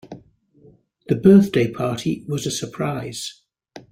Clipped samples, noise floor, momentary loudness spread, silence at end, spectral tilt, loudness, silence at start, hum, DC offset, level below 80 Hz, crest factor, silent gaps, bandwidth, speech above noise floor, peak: under 0.1%; -53 dBFS; 16 LU; 0.15 s; -6 dB/octave; -20 LUFS; 0.05 s; none; under 0.1%; -54 dBFS; 18 dB; none; 15.5 kHz; 34 dB; -2 dBFS